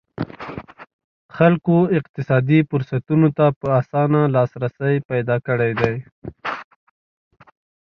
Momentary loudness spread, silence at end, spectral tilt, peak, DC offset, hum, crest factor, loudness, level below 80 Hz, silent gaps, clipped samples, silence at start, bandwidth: 14 LU; 1.3 s; -10 dB/octave; 0 dBFS; under 0.1%; none; 20 dB; -19 LUFS; -54 dBFS; 0.93-1.29 s, 2.09-2.14 s, 3.56-3.61 s, 5.05-5.09 s, 6.12-6.22 s; under 0.1%; 0.2 s; 6 kHz